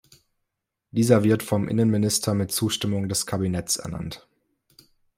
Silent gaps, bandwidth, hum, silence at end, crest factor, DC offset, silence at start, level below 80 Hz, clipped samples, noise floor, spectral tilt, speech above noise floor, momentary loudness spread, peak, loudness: none; 16 kHz; none; 1 s; 22 dB; under 0.1%; 0.95 s; -56 dBFS; under 0.1%; -81 dBFS; -5 dB/octave; 58 dB; 12 LU; -4 dBFS; -23 LUFS